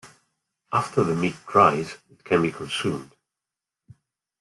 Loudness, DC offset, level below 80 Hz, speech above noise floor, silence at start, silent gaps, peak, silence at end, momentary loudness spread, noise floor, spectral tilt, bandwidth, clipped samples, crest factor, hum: -23 LUFS; under 0.1%; -62 dBFS; 65 dB; 0.05 s; none; -4 dBFS; 1.35 s; 14 LU; -88 dBFS; -5.5 dB/octave; 12 kHz; under 0.1%; 22 dB; none